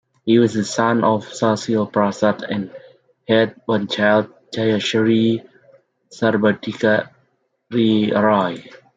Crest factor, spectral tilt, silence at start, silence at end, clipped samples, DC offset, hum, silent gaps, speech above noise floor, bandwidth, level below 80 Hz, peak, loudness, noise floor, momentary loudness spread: 18 dB; -5.5 dB/octave; 0.25 s; 0.2 s; under 0.1%; under 0.1%; none; none; 48 dB; 9.2 kHz; -64 dBFS; -2 dBFS; -18 LUFS; -65 dBFS; 9 LU